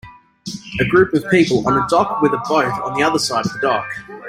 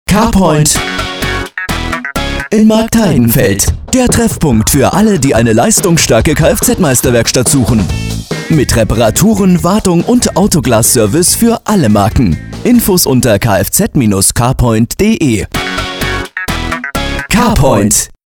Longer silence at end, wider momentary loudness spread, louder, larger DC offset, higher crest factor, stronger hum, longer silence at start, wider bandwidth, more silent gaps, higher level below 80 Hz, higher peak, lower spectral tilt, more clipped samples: second, 0 s vs 0.2 s; first, 13 LU vs 8 LU; second, -17 LUFS vs -10 LUFS; second, under 0.1% vs 0.3%; first, 16 dB vs 10 dB; neither; about the same, 0.05 s vs 0.1 s; second, 15.5 kHz vs over 20 kHz; neither; second, -48 dBFS vs -24 dBFS; about the same, -2 dBFS vs 0 dBFS; about the same, -5 dB/octave vs -4.5 dB/octave; neither